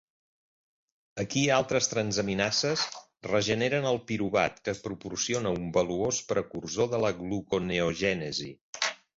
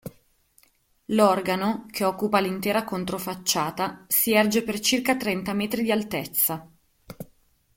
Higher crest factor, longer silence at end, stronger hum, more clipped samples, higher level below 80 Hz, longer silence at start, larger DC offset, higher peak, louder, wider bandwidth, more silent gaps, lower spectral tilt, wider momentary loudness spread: about the same, 20 dB vs 20 dB; second, 0.2 s vs 0.5 s; neither; neither; about the same, -58 dBFS vs -60 dBFS; first, 1.15 s vs 0.05 s; neither; second, -10 dBFS vs -6 dBFS; second, -29 LUFS vs -24 LUFS; second, 8 kHz vs 17 kHz; first, 8.61-8.73 s vs none; about the same, -3.5 dB/octave vs -3.5 dB/octave; about the same, 9 LU vs 10 LU